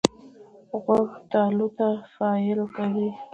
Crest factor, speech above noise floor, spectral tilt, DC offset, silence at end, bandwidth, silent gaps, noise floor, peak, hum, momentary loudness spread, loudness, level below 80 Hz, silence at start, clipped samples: 24 dB; 25 dB; -6 dB/octave; under 0.1%; 0.1 s; 8.4 kHz; none; -49 dBFS; 0 dBFS; none; 5 LU; -25 LUFS; -64 dBFS; 0.05 s; under 0.1%